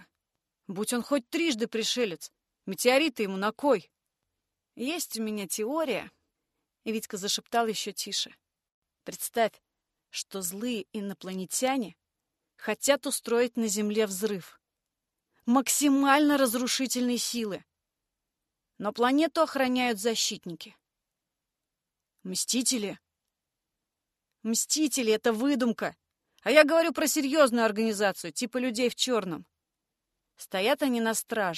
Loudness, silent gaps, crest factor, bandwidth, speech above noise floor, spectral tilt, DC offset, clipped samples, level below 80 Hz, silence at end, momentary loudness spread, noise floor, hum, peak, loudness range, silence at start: -28 LUFS; 8.74-8.82 s; 24 dB; 13 kHz; 60 dB; -2.5 dB/octave; under 0.1%; under 0.1%; -76 dBFS; 0 s; 15 LU; -87 dBFS; none; -6 dBFS; 8 LU; 0.7 s